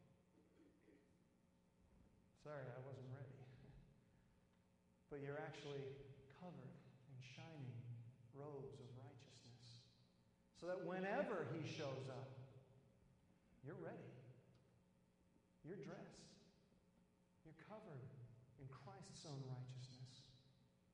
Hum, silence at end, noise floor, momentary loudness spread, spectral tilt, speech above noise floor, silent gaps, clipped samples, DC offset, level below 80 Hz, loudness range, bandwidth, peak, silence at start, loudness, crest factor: none; 0 s; -78 dBFS; 17 LU; -6 dB/octave; 26 dB; none; under 0.1%; under 0.1%; -82 dBFS; 12 LU; 10 kHz; -32 dBFS; 0 s; -55 LUFS; 24 dB